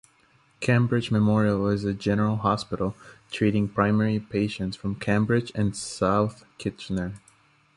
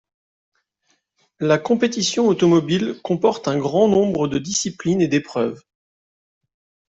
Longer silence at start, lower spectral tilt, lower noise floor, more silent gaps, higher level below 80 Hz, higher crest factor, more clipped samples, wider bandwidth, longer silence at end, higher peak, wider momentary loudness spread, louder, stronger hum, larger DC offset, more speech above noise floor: second, 0.6 s vs 1.4 s; first, -6.5 dB/octave vs -5 dB/octave; second, -61 dBFS vs -68 dBFS; neither; first, -50 dBFS vs -58 dBFS; about the same, 18 dB vs 18 dB; neither; first, 11.5 kHz vs 8.2 kHz; second, 0.6 s vs 1.35 s; second, -8 dBFS vs -4 dBFS; first, 10 LU vs 7 LU; second, -25 LUFS vs -19 LUFS; neither; neither; second, 37 dB vs 49 dB